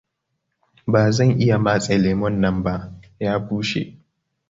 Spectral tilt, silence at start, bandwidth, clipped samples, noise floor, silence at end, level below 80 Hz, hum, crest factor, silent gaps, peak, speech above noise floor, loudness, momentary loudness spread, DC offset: -6.5 dB/octave; 0.85 s; 7.8 kHz; under 0.1%; -76 dBFS; 0.6 s; -44 dBFS; none; 18 dB; none; -2 dBFS; 57 dB; -20 LUFS; 12 LU; under 0.1%